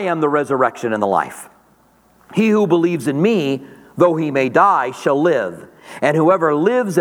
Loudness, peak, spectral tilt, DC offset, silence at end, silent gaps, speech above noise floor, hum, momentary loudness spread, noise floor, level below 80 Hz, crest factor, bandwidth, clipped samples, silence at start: -16 LUFS; 0 dBFS; -6.5 dB/octave; under 0.1%; 0 s; none; 38 dB; none; 10 LU; -54 dBFS; -66 dBFS; 16 dB; 17 kHz; under 0.1%; 0 s